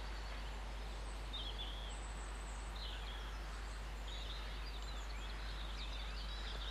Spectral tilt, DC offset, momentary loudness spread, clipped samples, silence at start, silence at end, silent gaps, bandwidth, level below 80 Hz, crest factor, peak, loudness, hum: -3.5 dB/octave; under 0.1%; 3 LU; under 0.1%; 0 s; 0 s; none; 12.5 kHz; -46 dBFS; 12 dB; -34 dBFS; -47 LUFS; none